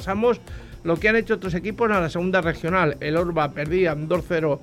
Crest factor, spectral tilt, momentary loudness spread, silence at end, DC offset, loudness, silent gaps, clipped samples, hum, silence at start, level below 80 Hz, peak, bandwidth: 16 dB; -7 dB/octave; 6 LU; 0 s; under 0.1%; -22 LUFS; none; under 0.1%; none; 0 s; -42 dBFS; -6 dBFS; 15 kHz